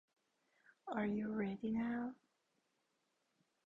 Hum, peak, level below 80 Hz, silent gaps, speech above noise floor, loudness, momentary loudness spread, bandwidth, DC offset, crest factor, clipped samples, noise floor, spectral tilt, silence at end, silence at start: none; -26 dBFS; -76 dBFS; none; 43 dB; -42 LUFS; 8 LU; 7 kHz; under 0.1%; 18 dB; under 0.1%; -84 dBFS; -8.5 dB/octave; 1.5 s; 0.85 s